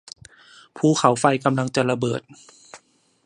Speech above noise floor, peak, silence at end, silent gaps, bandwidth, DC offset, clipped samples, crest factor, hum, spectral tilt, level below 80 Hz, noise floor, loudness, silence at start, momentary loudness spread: 34 dB; -2 dBFS; 0.5 s; none; 11.5 kHz; under 0.1%; under 0.1%; 22 dB; none; -5.5 dB/octave; -64 dBFS; -55 dBFS; -21 LUFS; 0.75 s; 16 LU